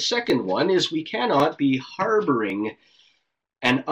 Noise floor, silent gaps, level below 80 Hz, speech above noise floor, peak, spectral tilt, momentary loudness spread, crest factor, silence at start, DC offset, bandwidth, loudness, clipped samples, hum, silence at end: -71 dBFS; none; -64 dBFS; 49 dB; -6 dBFS; -4.5 dB/octave; 5 LU; 18 dB; 0 s; under 0.1%; 14 kHz; -23 LUFS; under 0.1%; none; 0 s